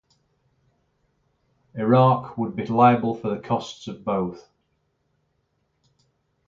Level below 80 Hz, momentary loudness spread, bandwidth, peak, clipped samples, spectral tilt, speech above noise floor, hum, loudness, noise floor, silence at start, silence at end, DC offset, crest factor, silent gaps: -62 dBFS; 15 LU; 7.4 kHz; -2 dBFS; under 0.1%; -8 dB/octave; 50 dB; none; -22 LUFS; -71 dBFS; 1.75 s; 2.05 s; under 0.1%; 22 dB; none